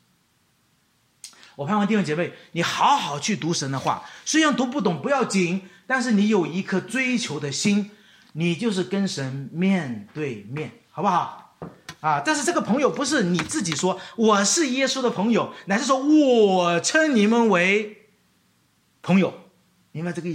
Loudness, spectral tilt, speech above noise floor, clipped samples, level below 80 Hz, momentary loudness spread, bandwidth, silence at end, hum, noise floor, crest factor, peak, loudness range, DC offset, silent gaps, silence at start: -22 LUFS; -4.5 dB/octave; 43 dB; under 0.1%; -68 dBFS; 14 LU; 13.5 kHz; 0 s; none; -65 dBFS; 16 dB; -6 dBFS; 6 LU; under 0.1%; none; 1.25 s